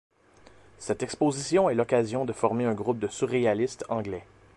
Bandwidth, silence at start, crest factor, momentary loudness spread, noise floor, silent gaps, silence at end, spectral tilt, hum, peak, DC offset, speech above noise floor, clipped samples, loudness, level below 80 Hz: 11.5 kHz; 0.8 s; 20 dB; 9 LU; -56 dBFS; none; 0.35 s; -5.5 dB/octave; none; -8 dBFS; under 0.1%; 29 dB; under 0.1%; -27 LUFS; -60 dBFS